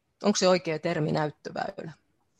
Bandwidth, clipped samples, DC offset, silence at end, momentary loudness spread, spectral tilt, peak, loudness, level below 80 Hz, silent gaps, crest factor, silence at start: 11.5 kHz; under 0.1%; under 0.1%; 0.45 s; 14 LU; -4.5 dB/octave; -10 dBFS; -27 LUFS; -68 dBFS; none; 20 dB; 0.2 s